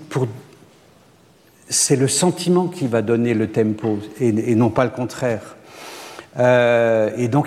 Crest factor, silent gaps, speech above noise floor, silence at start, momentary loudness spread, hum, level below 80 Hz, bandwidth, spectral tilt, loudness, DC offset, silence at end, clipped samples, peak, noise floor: 16 dB; none; 34 dB; 0 s; 17 LU; none; -60 dBFS; 15.5 kHz; -5 dB/octave; -18 LUFS; under 0.1%; 0 s; under 0.1%; -4 dBFS; -52 dBFS